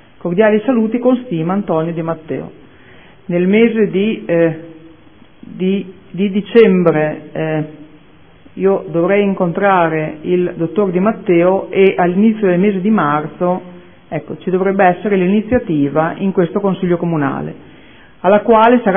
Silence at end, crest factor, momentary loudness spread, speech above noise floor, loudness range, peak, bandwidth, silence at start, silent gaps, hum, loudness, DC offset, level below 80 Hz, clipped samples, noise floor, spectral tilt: 0 s; 14 dB; 10 LU; 31 dB; 3 LU; 0 dBFS; 3.9 kHz; 0.25 s; none; none; -14 LUFS; 0.5%; -50 dBFS; under 0.1%; -45 dBFS; -11.5 dB/octave